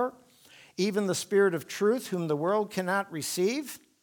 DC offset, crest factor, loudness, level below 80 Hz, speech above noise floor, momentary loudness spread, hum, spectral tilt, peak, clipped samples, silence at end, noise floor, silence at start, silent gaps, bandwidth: under 0.1%; 16 dB; -29 LUFS; -78 dBFS; 28 dB; 8 LU; none; -4.5 dB/octave; -12 dBFS; under 0.1%; 0.25 s; -56 dBFS; 0 s; none; 19.5 kHz